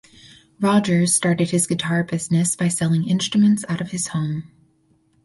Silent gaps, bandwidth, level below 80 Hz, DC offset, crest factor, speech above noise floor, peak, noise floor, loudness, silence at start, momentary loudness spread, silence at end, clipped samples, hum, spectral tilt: none; 12 kHz; -58 dBFS; under 0.1%; 16 dB; 42 dB; -4 dBFS; -61 dBFS; -20 LUFS; 0.6 s; 7 LU; 0.8 s; under 0.1%; none; -5 dB/octave